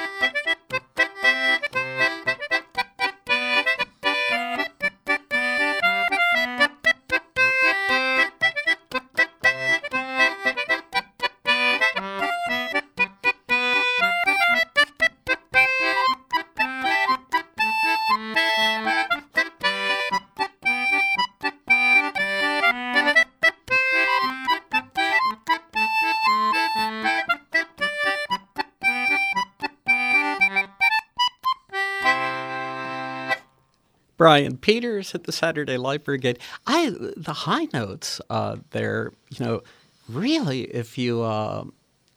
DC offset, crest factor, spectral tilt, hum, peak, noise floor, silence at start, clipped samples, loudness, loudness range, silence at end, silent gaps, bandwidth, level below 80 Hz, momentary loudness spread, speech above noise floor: under 0.1%; 22 dB; -3.5 dB/octave; none; 0 dBFS; -65 dBFS; 0 s; under 0.1%; -21 LUFS; 6 LU; 0.5 s; none; 18.5 kHz; -62 dBFS; 10 LU; 41 dB